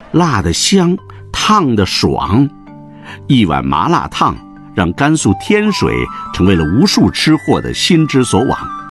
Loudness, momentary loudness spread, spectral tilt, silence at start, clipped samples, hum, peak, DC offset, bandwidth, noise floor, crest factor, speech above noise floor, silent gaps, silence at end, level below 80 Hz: -12 LUFS; 8 LU; -5 dB/octave; 0 s; under 0.1%; none; 0 dBFS; under 0.1%; 12.5 kHz; -33 dBFS; 12 dB; 21 dB; none; 0 s; -34 dBFS